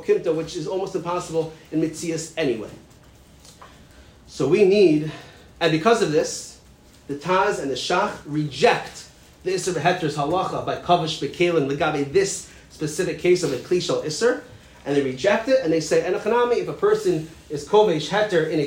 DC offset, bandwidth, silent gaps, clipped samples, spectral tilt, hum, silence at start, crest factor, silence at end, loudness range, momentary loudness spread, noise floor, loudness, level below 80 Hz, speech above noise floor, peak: under 0.1%; 16 kHz; none; under 0.1%; -5 dB/octave; none; 0 s; 18 dB; 0 s; 5 LU; 13 LU; -50 dBFS; -22 LUFS; -54 dBFS; 28 dB; -4 dBFS